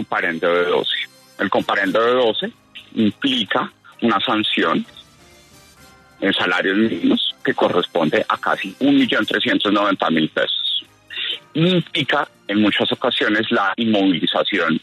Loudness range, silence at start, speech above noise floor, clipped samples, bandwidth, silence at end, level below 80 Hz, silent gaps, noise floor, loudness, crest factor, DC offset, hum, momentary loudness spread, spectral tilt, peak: 3 LU; 0 s; 30 dB; under 0.1%; 13.5 kHz; 0.05 s; -64 dBFS; none; -48 dBFS; -18 LUFS; 16 dB; under 0.1%; none; 7 LU; -5.5 dB/octave; -4 dBFS